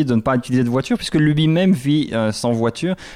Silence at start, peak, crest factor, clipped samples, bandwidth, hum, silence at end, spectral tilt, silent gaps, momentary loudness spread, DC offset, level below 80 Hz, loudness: 0 s; -6 dBFS; 10 dB; under 0.1%; 14.5 kHz; none; 0 s; -6.5 dB/octave; none; 5 LU; under 0.1%; -46 dBFS; -18 LUFS